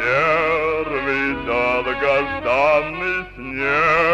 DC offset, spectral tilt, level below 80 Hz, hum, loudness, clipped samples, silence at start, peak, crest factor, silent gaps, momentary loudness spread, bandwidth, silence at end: under 0.1%; -5.5 dB/octave; -42 dBFS; none; -19 LUFS; under 0.1%; 0 s; -6 dBFS; 12 dB; none; 7 LU; 10.5 kHz; 0 s